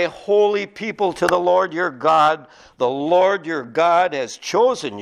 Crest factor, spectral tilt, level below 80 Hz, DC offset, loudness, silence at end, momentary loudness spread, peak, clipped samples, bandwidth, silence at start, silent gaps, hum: 18 dB; -4.5 dB/octave; -60 dBFS; under 0.1%; -18 LUFS; 0 s; 8 LU; 0 dBFS; under 0.1%; 13.5 kHz; 0 s; none; none